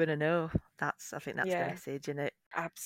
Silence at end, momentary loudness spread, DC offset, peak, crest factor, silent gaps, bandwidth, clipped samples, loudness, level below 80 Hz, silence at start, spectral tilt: 0 s; 8 LU; under 0.1%; -18 dBFS; 18 dB; 2.46-2.51 s; 16.5 kHz; under 0.1%; -35 LUFS; -56 dBFS; 0 s; -5.5 dB/octave